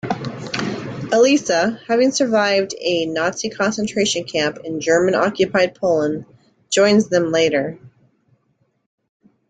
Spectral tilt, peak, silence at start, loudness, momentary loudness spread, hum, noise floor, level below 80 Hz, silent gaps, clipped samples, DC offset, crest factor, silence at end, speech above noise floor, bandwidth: -4 dB/octave; -2 dBFS; 0.05 s; -18 LUFS; 10 LU; none; -65 dBFS; -58 dBFS; none; under 0.1%; under 0.1%; 16 dB; 1.6 s; 48 dB; 9.4 kHz